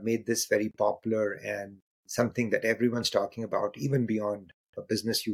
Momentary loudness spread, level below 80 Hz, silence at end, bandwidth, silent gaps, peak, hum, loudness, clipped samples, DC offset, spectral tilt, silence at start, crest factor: 9 LU; -68 dBFS; 0 s; 16.5 kHz; 1.82-2.04 s, 4.54-4.73 s; -10 dBFS; none; -29 LUFS; under 0.1%; under 0.1%; -4.5 dB/octave; 0 s; 20 dB